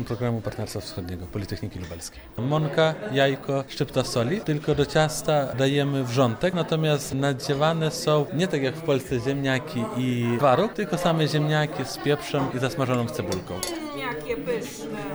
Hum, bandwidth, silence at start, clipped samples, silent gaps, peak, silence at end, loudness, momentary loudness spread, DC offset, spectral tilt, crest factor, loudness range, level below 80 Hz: none; over 20 kHz; 0 s; under 0.1%; none; -8 dBFS; 0 s; -25 LUFS; 10 LU; under 0.1%; -5.5 dB/octave; 16 dB; 3 LU; -50 dBFS